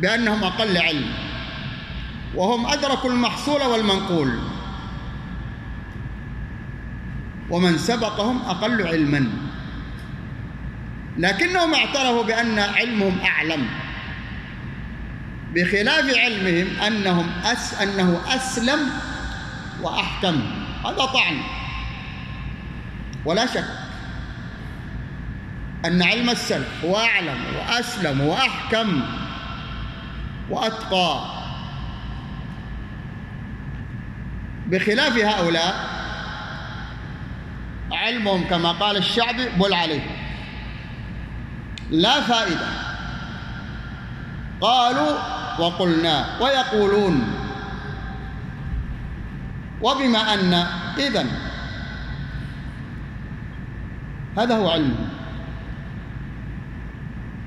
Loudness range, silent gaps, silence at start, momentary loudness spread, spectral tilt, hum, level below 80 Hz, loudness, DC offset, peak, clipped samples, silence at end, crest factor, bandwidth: 7 LU; none; 0 s; 16 LU; -4.5 dB/octave; none; -38 dBFS; -22 LUFS; under 0.1%; -4 dBFS; under 0.1%; 0 s; 20 dB; 13 kHz